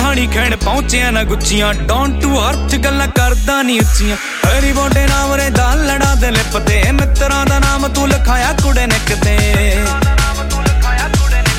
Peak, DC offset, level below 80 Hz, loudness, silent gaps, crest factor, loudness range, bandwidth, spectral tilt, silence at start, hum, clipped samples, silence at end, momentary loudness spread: 0 dBFS; under 0.1%; -14 dBFS; -13 LUFS; none; 12 dB; 1 LU; 16 kHz; -4.5 dB/octave; 0 s; none; under 0.1%; 0 s; 2 LU